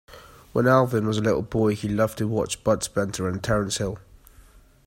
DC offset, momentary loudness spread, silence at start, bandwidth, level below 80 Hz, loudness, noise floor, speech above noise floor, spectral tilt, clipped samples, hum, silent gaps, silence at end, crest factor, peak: under 0.1%; 8 LU; 0.1 s; 16.5 kHz; -48 dBFS; -24 LUFS; -52 dBFS; 29 dB; -5.5 dB/octave; under 0.1%; none; none; 0.9 s; 18 dB; -6 dBFS